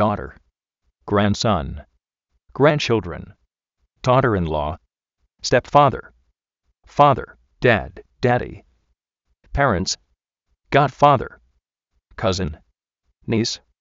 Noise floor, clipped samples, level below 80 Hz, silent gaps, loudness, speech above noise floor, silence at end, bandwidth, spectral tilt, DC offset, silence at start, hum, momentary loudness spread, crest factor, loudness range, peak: -73 dBFS; under 0.1%; -42 dBFS; none; -20 LUFS; 54 dB; 0.25 s; 7.6 kHz; -4.5 dB/octave; under 0.1%; 0 s; none; 18 LU; 20 dB; 2 LU; 0 dBFS